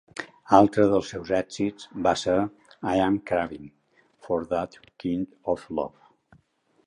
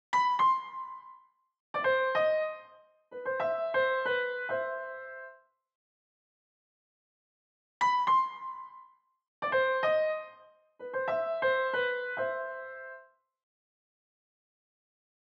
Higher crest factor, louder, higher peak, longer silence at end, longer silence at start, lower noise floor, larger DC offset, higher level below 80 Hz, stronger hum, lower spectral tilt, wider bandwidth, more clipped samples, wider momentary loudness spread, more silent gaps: first, 24 dB vs 16 dB; first, -25 LUFS vs -30 LUFS; first, -2 dBFS vs -16 dBFS; second, 1 s vs 2.35 s; about the same, 0.15 s vs 0.1 s; first, -66 dBFS vs -59 dBFS; neither; first, -54 dBFS vs under -90 dBFS; neither; first, -6 dB/octave vs -3 dB/octave; first, 10.5 kHz vs 7.8 kHz; neither; second, 15 LU vs 19 LU; second, none vs 1.60-1.74 s, 5.75-7.81 s, 9.28-9.42 s